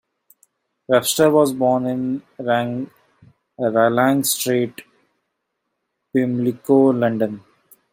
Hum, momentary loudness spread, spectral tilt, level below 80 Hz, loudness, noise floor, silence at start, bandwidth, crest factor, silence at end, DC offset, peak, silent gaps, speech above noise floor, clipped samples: none; 11 LU; -4.5 dB/octave; -64 dBFS; -19 LUFS; -76 dBFS; 0.9 s; 16.5 kHz; 18 dB; 0.55 s; under 0.1%; -2 dBFS; none; 58 dB; under 0.1%